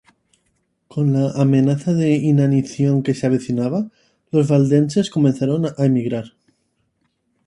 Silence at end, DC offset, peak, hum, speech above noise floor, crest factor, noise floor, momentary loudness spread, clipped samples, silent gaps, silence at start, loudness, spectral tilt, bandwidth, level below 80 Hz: 1.2 s; under 0.1%; -2 dBFS; none; 51 dB; 16 dB; -68 dBFS; 8 LU; under 0.1%; none; 0.95 s; -18 LUFS; -8 dB/octave; 10.5 kHz; -58 dBFS